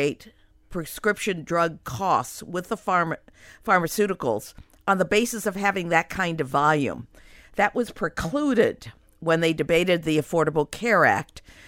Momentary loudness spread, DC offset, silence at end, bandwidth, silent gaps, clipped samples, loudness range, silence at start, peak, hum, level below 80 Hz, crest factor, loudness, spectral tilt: 12 LU; under 0.1%; 0.3 s; 16.5 kHz; none; under 0.1%; 3 LU; 0 s; -4 dBFS; none; -52 dBFS; 20 dB; -24 LUFS; -5 dB/octave